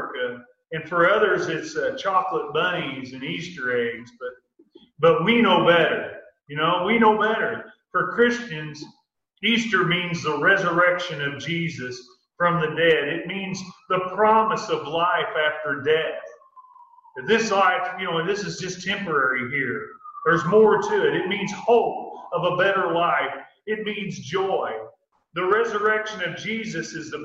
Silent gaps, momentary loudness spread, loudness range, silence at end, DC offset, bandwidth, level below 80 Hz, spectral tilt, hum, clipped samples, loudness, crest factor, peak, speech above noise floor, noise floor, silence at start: none; 14 LU; 4 LU; 0 s; under 0.1%; 7.8 kHz; -64 dBFS; -4.5 dB/octave; none; under 0.1%; -22 LUFS; 18 dB; -6 dBFS; 32 dB; -54 dBFS; 0 s